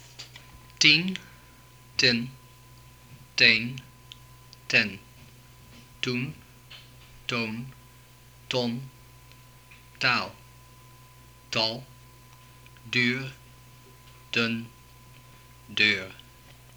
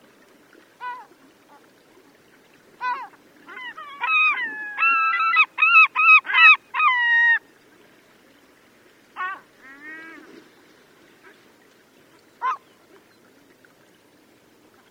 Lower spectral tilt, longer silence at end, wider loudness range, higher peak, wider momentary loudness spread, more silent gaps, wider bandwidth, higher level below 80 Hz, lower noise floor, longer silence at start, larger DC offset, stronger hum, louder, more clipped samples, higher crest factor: first, -3 dB/octave vs -0.5 dB/octave; second, 0.6 s vs 2.35 s; second, 10 LU vs 24 LU; about the same, -2 dBFS vs 0 dBFS; first, 28 LU vs 25 LU; neither; first, over 20 kHz vs 15 kHz; first, -60 dBFS vs -82 dBFS; about the same, -53 dBFS vs -56 dBFS; second, 0.2 s vs 0.8 s; neither; neither; second, -25 LUFS vs -16 LUFS; neither; about the same, 28 dB vs 24 dB